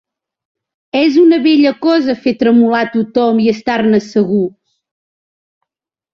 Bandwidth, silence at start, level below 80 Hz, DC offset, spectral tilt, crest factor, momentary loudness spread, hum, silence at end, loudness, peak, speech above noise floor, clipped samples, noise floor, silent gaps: 7 kHz; 0.95 s; -56 dBFS; under 0.1%; -6.5 dB/octave; 12 dB; 6 LU; none; 1.65 s; -12 LUFS; -2 dBFS; 72 dB; under 0.1%; -83 dBFS; none